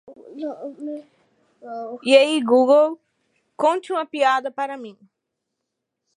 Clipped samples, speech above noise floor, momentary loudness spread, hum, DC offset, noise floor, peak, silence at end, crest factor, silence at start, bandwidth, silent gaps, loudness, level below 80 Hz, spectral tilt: under 0.1%; 61 dB; 21 LU; none; under 0.1%; -80 dBFS; -2 dBFS; 1.25 s; 20 dB; 0.1 s; 11 kHz; none; -19 LUFS; -84 dBFS; -3 dB/octave